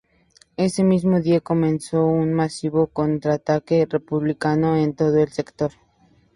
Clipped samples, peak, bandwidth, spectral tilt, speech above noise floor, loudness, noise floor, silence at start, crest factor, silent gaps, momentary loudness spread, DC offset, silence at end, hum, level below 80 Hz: under 0.1%; -4 dBFS; 11.5 kHz; -7.5 dB/octave; 38 dB; -21 LUFS; -58 dBFS; 0.6 s; 16 dB; none; 6 LU; under 0.1%; 0.65 s; none; -52 dBFS